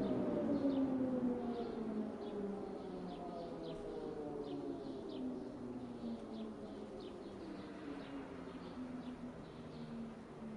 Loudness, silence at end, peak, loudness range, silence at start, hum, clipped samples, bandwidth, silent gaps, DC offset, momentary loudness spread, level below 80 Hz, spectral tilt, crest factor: -44 LUFS; 0 s; -26 dBFS; 8 LU; 0 s; none; under 0.1%; 11 kHz; none; under 0.1%; 12 LU; -66 dBFS; -8 dB/octave; 18 dB